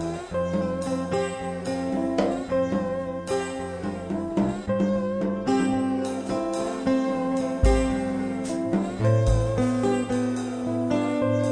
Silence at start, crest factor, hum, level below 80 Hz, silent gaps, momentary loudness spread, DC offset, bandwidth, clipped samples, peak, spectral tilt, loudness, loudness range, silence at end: 0 s; 18 dB; none; -36 dBFS; none; 6 LU; under 0.1%; 10 kHz; under 0.1%; -8 dBFS; -7 dB/octave; -26 LUFS; 3 LU; 0 s